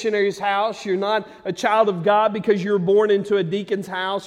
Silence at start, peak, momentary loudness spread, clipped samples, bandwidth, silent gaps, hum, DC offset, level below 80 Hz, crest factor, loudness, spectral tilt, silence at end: 0 s; -4 dBFS; 7 LU; under 0.1%; 11.5 kHz; none; none; under 0.1%; -66 dBFS; 16 dB; -20 LUFS; -5.5 dB/octave; 0 s